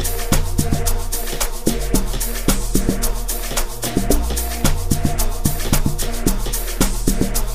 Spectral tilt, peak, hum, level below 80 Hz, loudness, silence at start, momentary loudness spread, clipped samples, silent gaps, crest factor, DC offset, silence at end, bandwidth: -4 dB/octave; 0 dBFS; none; -20 dBFS; -21 LUFS; 0 s; 4 LU; under 0.1%; none; 18 dB; 5%; 0 s; 15.5 kHz